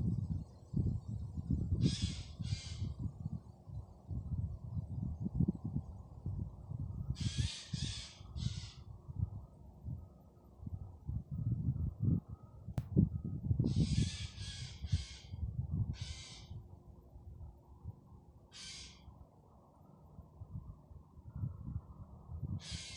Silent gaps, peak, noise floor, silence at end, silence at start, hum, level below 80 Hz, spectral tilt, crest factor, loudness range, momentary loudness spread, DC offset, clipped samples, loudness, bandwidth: none; -16 dBFS; -63 dBFS; 0 s; 0 s; none; -50 dBFS; -6 dB/octave; 24 dB; 16 LU; 21 LU; under 0.1%; under 0.1%; -41 LUFS; 11 kHz